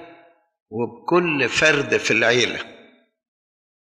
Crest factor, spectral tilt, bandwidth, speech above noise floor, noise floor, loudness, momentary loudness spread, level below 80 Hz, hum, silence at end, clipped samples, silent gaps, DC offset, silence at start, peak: 18 dB; -3.5 dB/octave; 11 kHz; 32 dB; -51 dBFS; -19 LUFS; 15 LU; -60 dBFS; none; 1.2 s; under 0.1%; 0.60-0.66 s; under 0.1%; 0 s; -4 dBFS